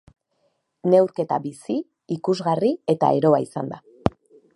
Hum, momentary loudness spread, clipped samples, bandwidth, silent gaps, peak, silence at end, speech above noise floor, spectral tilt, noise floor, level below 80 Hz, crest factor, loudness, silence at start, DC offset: none; 11 LU; under 0.1%; 11.5 kHz; none; 0 dBFS; 0.45 s; 49 dB; -7.5 dB/octave; -70 dBFS; -52 dBFS; 22 dB; -22 LUFS; 0.85 s; under 0.1%